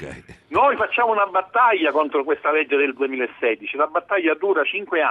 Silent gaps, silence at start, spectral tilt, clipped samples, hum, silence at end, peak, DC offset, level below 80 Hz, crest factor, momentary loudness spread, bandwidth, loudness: none; 0 s; -5.5 dB/octave; under 0.1%; none; 0 s; -6 dBFS; under 0.1%; -60 dBFS; 14 dB; 6 LU; 8 kHz; -20 LUFS